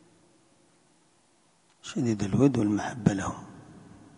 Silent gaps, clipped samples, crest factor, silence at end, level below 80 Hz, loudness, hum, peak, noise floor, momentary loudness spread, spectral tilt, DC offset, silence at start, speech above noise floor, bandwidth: none; under 0.1%; 24 dB; 0.4 s; -54 dBFS; -27 LUFS; none; -6 dBFS; -65 dBFS; 21 LU; -7 dB/octave; under 0.1%; 1.85 s; 39 dB; 11 kHz